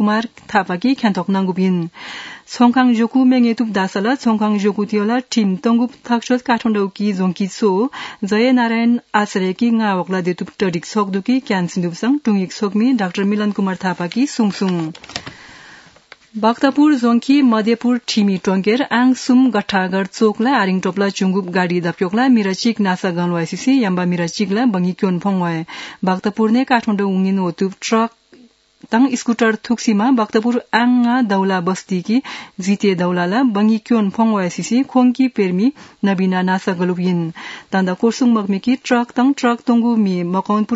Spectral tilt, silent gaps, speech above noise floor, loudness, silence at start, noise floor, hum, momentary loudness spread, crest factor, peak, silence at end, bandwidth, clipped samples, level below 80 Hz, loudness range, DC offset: -6 dB/octave; none; 32 dB; -17 LUFS; 0 s; -48 dBFS; none; 6 LU; 16 dB; 0 dBFS; 0 s; 8 kHz; under 0.1%; -64 dBFS; 3 LU; under 0.1%